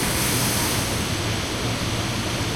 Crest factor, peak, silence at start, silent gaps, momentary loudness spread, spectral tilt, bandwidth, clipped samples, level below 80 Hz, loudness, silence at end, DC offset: 14 dB; -10 dBFS; 0 s; none; 4 LU; -3.5 dB/octave; 16.5 kHz; under 0.1%; -38 dBFS; -23 LUFS; 0 s; under 0.1%